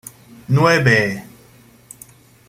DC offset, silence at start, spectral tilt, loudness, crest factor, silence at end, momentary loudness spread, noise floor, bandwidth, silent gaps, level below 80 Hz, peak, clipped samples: under 0.1%; 0.5 s; -5.5 dB/octave; -15 LUFS; 18 dB; 1.3 s; 19 LU; -48 dBFS; 16 kHz; none; -52 dBFS; -2 dBFS; under 0.1%